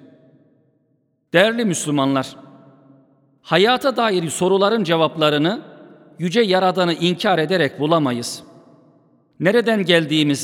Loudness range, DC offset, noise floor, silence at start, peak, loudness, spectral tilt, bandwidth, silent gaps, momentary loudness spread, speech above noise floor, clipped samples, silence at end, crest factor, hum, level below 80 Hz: 2 LU; under 0.1%; -65 dBFS; 1.35 s; 0 dBFS; -18 LUFS; -4.5 dB/octave; 17.5 kHz; none; 7 LU; 48 dB; under 0.1%; 0 s; 20 dB; none; -68 dBFS